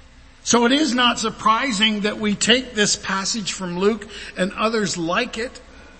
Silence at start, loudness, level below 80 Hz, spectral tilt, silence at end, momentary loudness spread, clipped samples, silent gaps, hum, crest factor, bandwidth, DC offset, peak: 0.45 s; -19 LUFS; -48 dBFS; -2.5 dB/octave; 0.1 s; 10 LU; under 0.1%; none; none; 20 dB; 8.8 kHz; under 0.1%; 0 dBFS